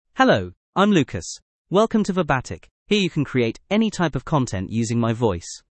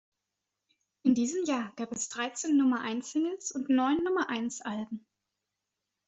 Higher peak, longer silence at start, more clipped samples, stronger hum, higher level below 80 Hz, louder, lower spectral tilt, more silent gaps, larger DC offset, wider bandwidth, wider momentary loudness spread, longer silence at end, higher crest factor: first, -2 dBFS vs -12 dBFS; second, 0.15 s vs 1.05 s; neither; neither; first, -48 dBFS vs -74 dBFS; first, -21 LUFS vs -30 LUFS; first, -5.5 dB/octave vs -3.5 dB/octave; first, 0.57-0.73 s, 1.42-1.65 s, 2.71-2.86 s vs none; neither; about the same, 8.8 kHz vs 8.2 kHz; about the same, 12 LU vs 10 LU; second, 0.2 s vs 1.1 s; about the same, 20 dB vs 18 dB